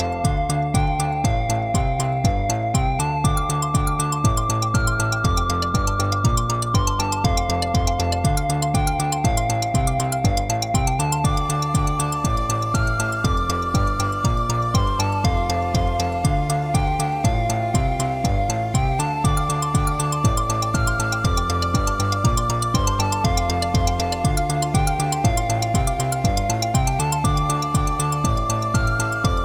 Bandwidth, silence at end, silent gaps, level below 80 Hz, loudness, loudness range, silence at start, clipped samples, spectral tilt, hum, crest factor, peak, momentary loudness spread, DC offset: 19 kHz; 0 s; none; -28 dBFS; -21 LUFS; 1 LU; 0 s; under 0.1%; -5 dB/octave; none; 14 dB; -6 dBFS; 2 LU; 0.2%